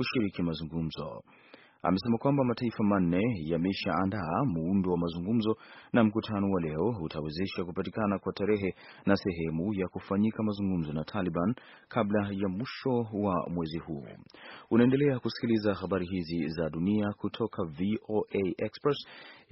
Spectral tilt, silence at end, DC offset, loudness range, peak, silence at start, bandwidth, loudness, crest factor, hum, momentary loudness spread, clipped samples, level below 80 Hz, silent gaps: -6.5 dB/octave; 0.15 s; under 0.1%; 3 LU; -10 dBFS; 0 s; 5.8 kHz; -31 LUFS; 22 dB; none; 9 LU; under 0.1%; -58 dBFS; none